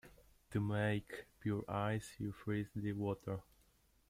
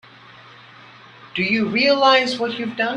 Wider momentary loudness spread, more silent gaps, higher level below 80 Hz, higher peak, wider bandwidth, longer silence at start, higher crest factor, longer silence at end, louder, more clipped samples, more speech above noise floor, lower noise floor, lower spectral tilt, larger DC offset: about the same, 9 LU vs 10 LU; neither; about the same, -66 dBFS vs -64 dBFS; second, -24 dBFS vs -2 dBFS; first, 15.5 kHz vs 11 kHz; second, 0.05 s vs 1.25 s; about the same, 18 dB vs 20 dB; first, 0.7 s vs 0 s; second, -41 LUFS vs -18 LUFS; neither; first, 32 dB vs 26 dB; first, -72 dBFS vs -45 dBFS; first, -7 dB/octave vs -4.5 dB/octave; neither